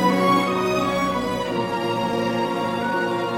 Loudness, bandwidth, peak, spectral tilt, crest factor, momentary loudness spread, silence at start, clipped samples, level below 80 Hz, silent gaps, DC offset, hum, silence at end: -22 LUFS; 16.5 kHz; -6 dBFS; -5.5 dB/octave; 16 dB; 6 LU; 0 s; under 0.1%; -50 dBFS; none; under 0.1%; none; 0 s